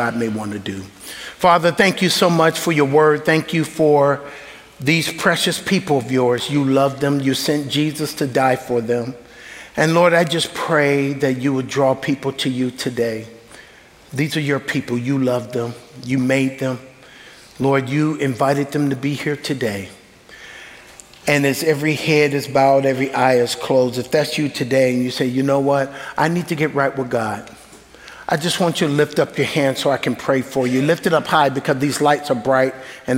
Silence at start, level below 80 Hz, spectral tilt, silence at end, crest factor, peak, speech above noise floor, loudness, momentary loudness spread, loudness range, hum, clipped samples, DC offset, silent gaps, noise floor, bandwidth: 0 s; -56 dBFS; -5 dB/octave; 0 s; 18 dB; -2 dBFS; 28 dB; -18 LUFS; 11 LU; 5 LU; none; under 0.1%; under 0.1%; none; -45 dBFS; 16 kHz